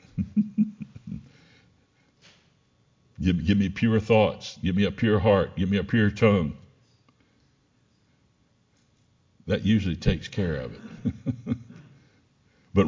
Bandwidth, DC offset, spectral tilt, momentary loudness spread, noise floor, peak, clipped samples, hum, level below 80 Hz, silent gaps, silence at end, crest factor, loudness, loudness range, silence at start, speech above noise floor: 7.6 kHz; under 0.1%; -7.5 dB/octave; 16 LU; -66 dBFS; -6 dBFS; under 0.1%; none; -44 dBFS; none; 0 s; 20 dB; -25 LUFS; 9 LU; 0.15 s; 42 dB